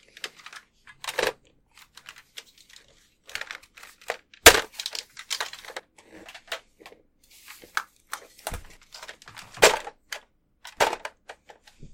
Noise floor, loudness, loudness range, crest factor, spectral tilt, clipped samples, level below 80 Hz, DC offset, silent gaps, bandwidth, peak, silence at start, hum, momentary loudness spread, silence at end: -60 dBFS; -24 LUFS; 15 LU; 30 dB; -0.5 dB/octave; under 0.1%; -50 dBFS; under 0.1%; none; 16.5 kHz; 0 dBFS; 0.25 s; none; 26 LU; 0.05 s